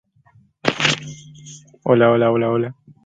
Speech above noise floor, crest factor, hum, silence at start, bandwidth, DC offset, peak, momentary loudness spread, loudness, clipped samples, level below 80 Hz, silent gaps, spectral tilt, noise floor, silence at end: 36 dB; 20 dB; none; 0.65 s; 9.4 kHz; under 0.1%; 0 dBFS; 24 LU; -18 LUFS; under 0.1%; -58 dBFS; none; -5 dB/octave; -55 dBFS; 0.35 s